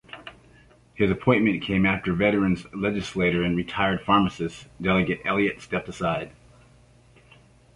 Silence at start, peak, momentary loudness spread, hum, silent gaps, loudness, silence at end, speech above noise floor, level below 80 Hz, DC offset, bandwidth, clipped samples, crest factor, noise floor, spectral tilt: 0.15 s; -6 dBFS; 11 LU; 60 Hz at -50 dBFS; none; -24 LUFS; 1.45 s; 31 dB; -48 dBFS; under 0.1%; 11 kHz; under 0.1%; 20 dB; -55 dBFS; -6.5 dB/octave